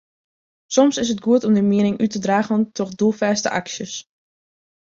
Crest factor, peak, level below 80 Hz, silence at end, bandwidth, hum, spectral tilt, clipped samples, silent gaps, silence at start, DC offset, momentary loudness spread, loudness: 18 dB; -2 dBFS; -60 dBFS; 0.95 s; 7.6 kHz; none; -5 dB/octave; under 0.1%; none; 0.7 s; under 0.1%; 10 LU; -19 LUFS